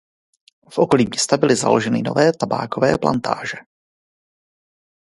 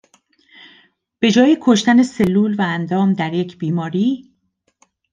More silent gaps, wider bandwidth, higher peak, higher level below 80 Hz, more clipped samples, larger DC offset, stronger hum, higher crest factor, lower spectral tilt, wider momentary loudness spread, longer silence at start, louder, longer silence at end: neither; first, 11.5 kHz vs 9.6 kHz; about the same, 0 dBFS vs -2 dBFS; about the same, -54 dBFS vs -58 dBFS; neither; neither; neither; about the same, 20 dB vs 16 dB; second, -4.5 dB/octave vs -6 dB/octave; about the same, 9 LU vs 9 LU; second, 0.7 s vs 1.2 s; about the same, -18 LUFS vs -16 LUFS; first, 1.4 s vs 0.9 s